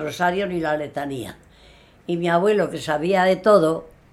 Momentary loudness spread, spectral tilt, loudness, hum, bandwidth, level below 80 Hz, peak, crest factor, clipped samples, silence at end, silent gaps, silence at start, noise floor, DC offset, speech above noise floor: 14 LU; -6 dB/octave; -21 LUFS; none; 13.5 kHz; -54 dBFS; -4 dBFS; 18 dB; under 0.1%; 0.25 s; none; 0 s; -50 dBFS; under 0.1%; 30 dB